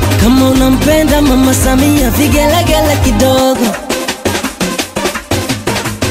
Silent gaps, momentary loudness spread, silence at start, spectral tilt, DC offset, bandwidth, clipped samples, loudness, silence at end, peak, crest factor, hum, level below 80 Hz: none; 7 LU; 0 s; -4.5 dB/octave; under 0.1%; 16.5 kHz; under 0.1%; -11 LUFS; 0 s; 0 dBFS; 10 dB; none; -20 dBFS